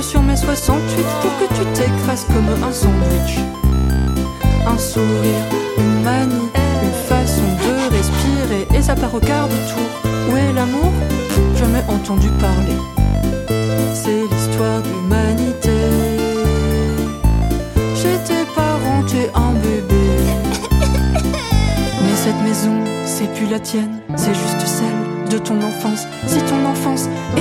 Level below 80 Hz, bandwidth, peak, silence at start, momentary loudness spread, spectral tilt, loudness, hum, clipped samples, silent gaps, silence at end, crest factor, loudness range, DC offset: -22 dBFS; 17 kHz; 0 dBFS; 0 s; 4 LU; -5.5 dB/octave; -17 LUFS; none; under 0.1%; none; 0 s; 16 dB; 2 LU; under 0.1%